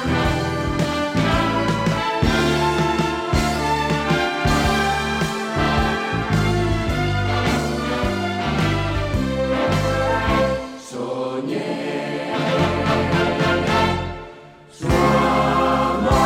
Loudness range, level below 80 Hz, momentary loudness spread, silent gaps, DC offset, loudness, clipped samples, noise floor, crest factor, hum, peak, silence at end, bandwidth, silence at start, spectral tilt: 3 LU; -32 dBFS; 7 LU; none; under 0.1%; -20 LUFS; under 0.1%; -42 dBFS; 16 dB; none; -4 dBFS; 0 s; 16.5 kHz; 0 s; -5.5 dB/octave